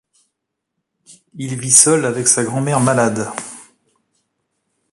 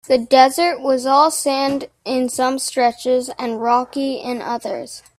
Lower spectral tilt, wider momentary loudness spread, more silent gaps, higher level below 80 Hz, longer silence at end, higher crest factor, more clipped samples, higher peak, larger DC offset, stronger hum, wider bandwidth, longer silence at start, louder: about the same, -3.5 dB/octave vs -2.5 dB/octave; first, 19 LU vs 11 LU; neither; about the same, -58 dBFS vs -62 dBFS; first, 1.3 s vs 0.2 s; about the same, 20 dB vs 18 dB; neither; about the same, 0 dBFS vs 0 dBFS; neither; neither; about the same, 16 kHz vs 16 kHz; first, 1.1 s vs 0.1 s; first, -14 LUFS vs -18 LUFS